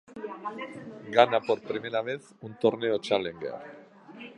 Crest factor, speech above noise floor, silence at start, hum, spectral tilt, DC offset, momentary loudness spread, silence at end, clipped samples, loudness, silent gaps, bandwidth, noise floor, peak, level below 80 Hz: 26 dB; 19 dB; 0.1 s; none; -5.5 dB/octave; under 0.1%; 20 LU; 0.05 s; under 0.1%; -28 LUFS; none; 10.5 kHz; -47 dBFS; -2 dBFS; -72 dBFS